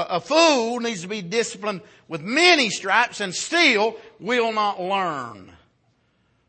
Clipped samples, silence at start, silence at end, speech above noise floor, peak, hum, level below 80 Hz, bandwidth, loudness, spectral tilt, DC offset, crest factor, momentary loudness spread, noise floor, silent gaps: under 0.1%; 0 s; 1.05 s; 43 dB; -4 dBFS; none; -70 dBFS; 8.8 kHz; -20 LUFS; -2.5 dB/octave; under 0.1%; 18 dB; 16 LU; -65 dBFS; none